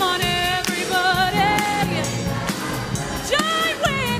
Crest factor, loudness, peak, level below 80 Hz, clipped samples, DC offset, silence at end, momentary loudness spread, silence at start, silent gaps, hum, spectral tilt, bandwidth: 16 dB; -20 LUFS; -6 dBFS; -40 dBFS; under 0.1%; under 0.1%; 0 s; 7 LU; 0 s; none; none; -3.5 dB/octave; 15.5 kHz